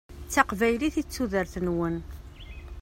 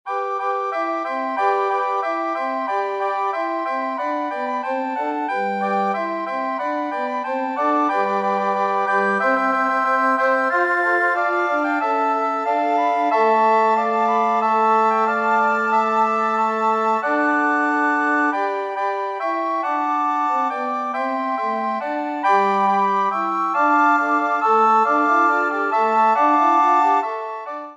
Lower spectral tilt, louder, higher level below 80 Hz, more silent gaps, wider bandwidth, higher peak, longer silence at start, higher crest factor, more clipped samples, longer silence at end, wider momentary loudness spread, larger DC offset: about the same, -5 dB/octave vs -5.5 dB/octave; second, -27 LUFS vs -19 LUFS; first, -44 dBFS vs -78 dBFS; neither; first, 16 kHz vs 9.8 kHz; about the same, -4 dBFS vs -4 dBFS; about the same, 0.1 s vs 0.05 s; first, 24 dB vs 14 dB; neither; about the same, 0 s vs 0 s; first, 20 LU vs 8 LU; neither